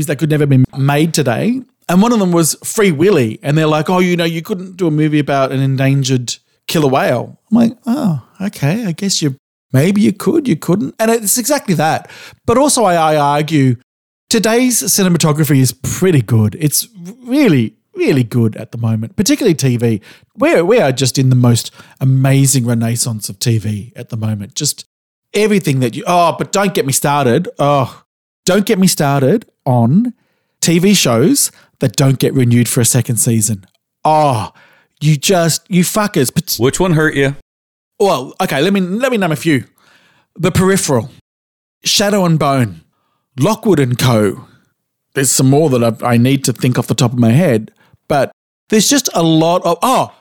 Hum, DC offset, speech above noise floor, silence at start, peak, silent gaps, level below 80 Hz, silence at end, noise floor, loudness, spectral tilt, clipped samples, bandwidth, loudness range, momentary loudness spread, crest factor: none; under 0.1%; 54 dB; 0 s; -2 dBFS; 9.39-9.69 s, 13.83-14.27 s, 24.86-25.22 s, 28.05-28.43 s, 37.42-37.91 s, 41.21-41.81 s, 48.33-48.67 s; -46 dBFS; 0.1 s; -67 dBFS; -13 LUFS; -5 dB/octave; under 0.1%; 18.5 kHz; 3 LU; 7 LU; 12 dB